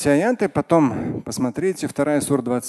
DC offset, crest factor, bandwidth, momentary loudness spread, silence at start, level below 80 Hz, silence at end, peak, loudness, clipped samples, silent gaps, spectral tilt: under 0.1%; 18 dB; 12.5 kHz; 7 LU; 0 s; -50 dBFS; 0 s; -2 dBFS; -21 LUFS; under 0.1%; none; -6 dB/octave